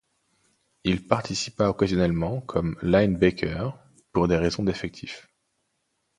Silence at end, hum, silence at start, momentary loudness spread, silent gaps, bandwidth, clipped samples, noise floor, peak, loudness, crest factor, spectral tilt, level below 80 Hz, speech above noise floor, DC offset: 1 s; none; 0.85 s; 12 LU; none; 11 kHz; under 0.1%; -75 dBFS; -2 dBFS; -25 LUFS; 24 dB; -6 dB/octave; -44 dBFS; 51 dB; under 0.1%